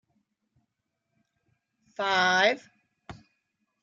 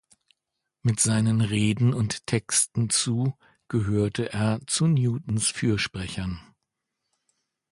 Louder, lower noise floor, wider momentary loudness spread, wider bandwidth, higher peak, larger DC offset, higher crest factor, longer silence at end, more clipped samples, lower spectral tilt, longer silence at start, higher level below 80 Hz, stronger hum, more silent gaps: about the same, -25 LUFS vs -25 LUFS; about the same, -82 dBFS vs -83 dBFS; first, 16 LU vs 8 LU; second, 7.6 kHz vs 11.5 kHz; about the same, -8 dBFS vs -8 dBFS; neither; first, 24 dB vs 18 dB; second, 0.7 s vs 1.3 s; neither; second, -2.5 dB/octave vs -4.5 dB/octave; first, 2 s vs 0.85 s; second, -70 dBFS vs -50 dBFS; neither; neither